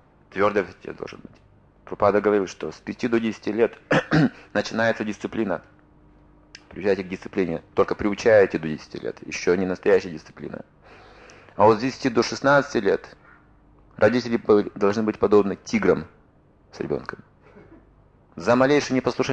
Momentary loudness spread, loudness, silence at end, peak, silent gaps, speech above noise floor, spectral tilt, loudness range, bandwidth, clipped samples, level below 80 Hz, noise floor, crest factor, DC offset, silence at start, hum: 17 LU; -22 LUFS; 0 s; -4 dBFS; none; 34 dB; -6 dB/octave; 4 LU; 8.4 kHz; under 0.1%; -54 dBFS; -56 dBFS; 18 dB; under 0.1%; 0.35 s; none